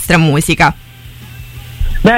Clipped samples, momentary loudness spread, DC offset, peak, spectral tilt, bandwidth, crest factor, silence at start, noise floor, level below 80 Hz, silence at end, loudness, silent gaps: under 0.1%; 22 LU; under 0.1%; 0 dBFS; -5 dB/octave; 16.5 kHz; 12 dB; 0 s; -33 dBFS; -22 dBFS; 0 s; -12 LUFS; none